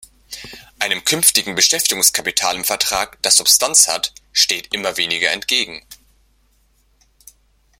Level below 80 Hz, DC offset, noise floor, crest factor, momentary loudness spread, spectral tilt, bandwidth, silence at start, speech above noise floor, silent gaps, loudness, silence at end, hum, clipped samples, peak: -54 dBFS; under 0.1%; -58 dBFS; 20 dB; 17 LU; 0.5 dB/octave; 17 kHz; 0.3 s; 41 dB; none; -14 LUFS; 1.85 s; none; under 0.1%; 0 dBFS